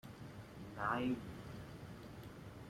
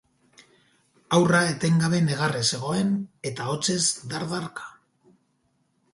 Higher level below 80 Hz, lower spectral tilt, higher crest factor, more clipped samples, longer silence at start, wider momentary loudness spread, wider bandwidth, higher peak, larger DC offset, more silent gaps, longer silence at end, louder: about the same, -64 dBFS vs -62 dBFS; first, -6.5 dB/octave vs -4.5 dB/octave; about the same, 22 dB vs 20 dB; neither; second, 0.05 s vs 1.1 s; first, 15 LU vs 12 LU; first, 16 kHz vs 11.5 kHz; second, -24 dBFS vs -6 dBFS; neither; neither; second, 0 s vs 1.25 s; second, -45 LUFS vs -24 LUFS